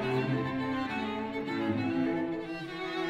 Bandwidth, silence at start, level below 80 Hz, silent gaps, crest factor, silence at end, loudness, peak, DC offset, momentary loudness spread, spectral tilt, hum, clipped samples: 9.8 kHz; 0 s; -62 dBFS; none; 14 dB; 0 s; -33 LUFS; -18 dBFS; under 0.1%; 6 LU; -7 dB/octave; none; under 0.1%